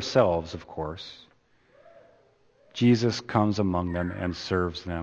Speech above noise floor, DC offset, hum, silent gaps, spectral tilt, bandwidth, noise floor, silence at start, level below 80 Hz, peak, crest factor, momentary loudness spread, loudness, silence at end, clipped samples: 36 dB; under 0.1%; none; none; -6.5 dB/octave; 7.8 kHz; -62 dBFS; 0 s; -52 dBFS; -6 dBFS; 22 dB; 15 LU; -27 LUFS; 0 s; under 0.1%